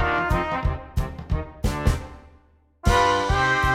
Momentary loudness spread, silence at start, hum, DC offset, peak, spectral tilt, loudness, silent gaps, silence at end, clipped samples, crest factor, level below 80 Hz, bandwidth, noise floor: 11 LU; 0 s; none; under 0.1%; -6 dBFS; -5 dB/octave; -24 LUFS; none; 0 s; under 0.1%; 18 dB; -30 dBFS; 16 kHz; -56 dBFS